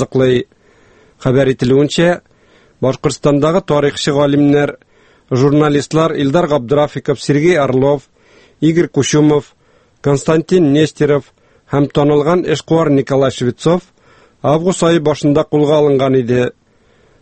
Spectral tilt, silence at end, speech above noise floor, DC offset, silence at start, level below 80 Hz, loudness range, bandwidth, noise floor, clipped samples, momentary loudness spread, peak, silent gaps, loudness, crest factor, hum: -6.5 dB/octave; 0.7 s; 39 dB; under 0.1%; 0 s; -44 dBFS; 1 LU; 8.8 kHz; -51 dBFS; under 0.1%; 7 LU; 0 dBFS; none; -13 LUFS; 14 dB; none